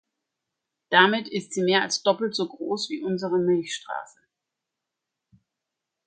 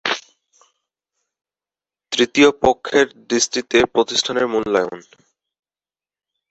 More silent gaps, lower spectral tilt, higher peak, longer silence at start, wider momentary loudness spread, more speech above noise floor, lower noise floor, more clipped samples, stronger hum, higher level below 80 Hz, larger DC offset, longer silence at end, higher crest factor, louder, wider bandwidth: neither; first, -4 dB/octave vs -2.5 dB/octave; about the same, -2 dBFS vs 0 dBFS; first, 0.9 s vs 0.05 s; about the same, 13 LU vs 11 LU; second, 61 dB vs over 73 dB; second, -85 dBFS vs under -90 dBFS; neither; neither; second, -76 dBFS vs -52 dBFS; neither; first, 2 s vs 1.5 s; about the same, 24 dB vs 20 dB; second, -24 LUFS vs -18 LUFS; first, 9.4 kHz vs 8.2 kHz